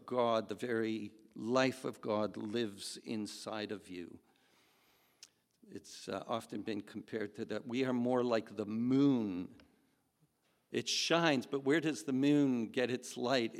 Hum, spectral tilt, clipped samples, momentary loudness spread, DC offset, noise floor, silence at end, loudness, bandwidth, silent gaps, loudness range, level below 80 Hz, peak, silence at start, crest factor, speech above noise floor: none; -4.5 dB/octave; under 0.1%; 14 LU; under 0.1%; -76 dBFS; 0 s; -36 LUFS; 14 kHz; none; 12 LU; -84 dBFS; -14 dBFS; 0.05 s; 22 dB; 41 dB